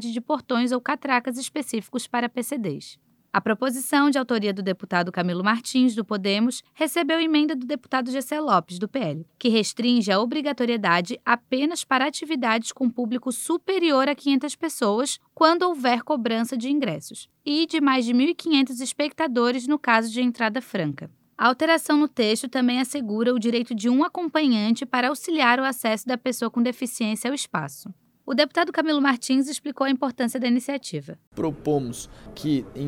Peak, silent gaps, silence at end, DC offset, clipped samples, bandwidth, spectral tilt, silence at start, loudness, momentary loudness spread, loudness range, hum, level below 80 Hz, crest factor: -2 dBFS; 31.27-31.32 s; 0 s; under 0.1%; under 0.1%; 16.5 kHz; -4 dB/octave; 0 s; -23 LUFS; 9 LU; 3 LU; none; -64 dBFS; 20 dB